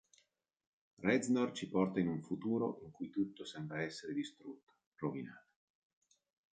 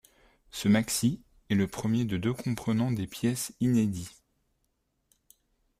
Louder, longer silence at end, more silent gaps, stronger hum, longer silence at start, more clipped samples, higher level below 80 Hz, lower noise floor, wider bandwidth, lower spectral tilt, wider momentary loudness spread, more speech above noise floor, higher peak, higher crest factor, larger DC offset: second, -39 LUFS vs -29 LUFS; second, 1.15 s vs 1.7 s; first, 4.63-4.67 s, 4.86-4.92 s vs none; neither; first, 1 s vs 0.55 s; neither; second, -76 dBFS vs -60 dBFS; about the same, -77 dBFS vs -76 dBFS; second, 9 kHz vs 15.5 kHz; about the same, -6 dB/octave vs -5.5 dB/octave; first, 13 LU vs 8 LU; second, 39 dB vs 48 dB; second, -18 dBFS vs -12 dBFS; about the same, 22 dB vs 18 dB; neither